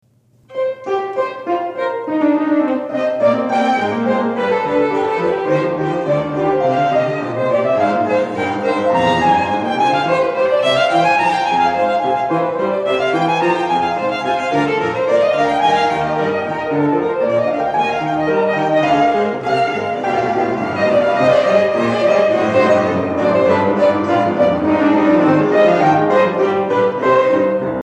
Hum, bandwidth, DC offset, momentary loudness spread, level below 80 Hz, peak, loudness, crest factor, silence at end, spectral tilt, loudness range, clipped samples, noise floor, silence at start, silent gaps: none; 10.5 kHz; under 0.1%; 6 LU; -54 dBFS; 0 dBFS; -15 LUFS; 14 dB; 0 s; -6.5 dB/octave; 3 LU; under 0.1%; -47 dBFS; 0.5 s; none